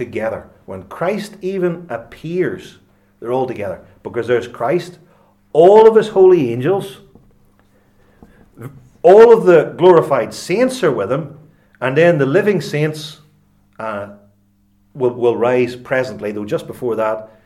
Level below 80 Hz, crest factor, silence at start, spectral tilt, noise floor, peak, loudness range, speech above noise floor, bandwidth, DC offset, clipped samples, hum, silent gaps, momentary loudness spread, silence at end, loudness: -56 dBFS; 16 dB; 0 s; -6.5 dB/octave; -56 dBFS; 0 dBFS; 10 LU; 42 dB; 13.5 kHz; under 0.1%; 0.1%; none; none; 22 LU; 0.2 s; -14 LUFS